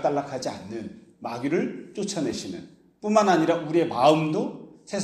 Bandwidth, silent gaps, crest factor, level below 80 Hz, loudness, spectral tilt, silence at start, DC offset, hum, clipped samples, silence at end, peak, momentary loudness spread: 12.5 kHz; none; 20 dB; -66 dBFS; -25 LUFS; -5.5 dB/octave; 0 s; under 0.1%; none; under 0.1%; 0 s; -4 dBFS; 17 LU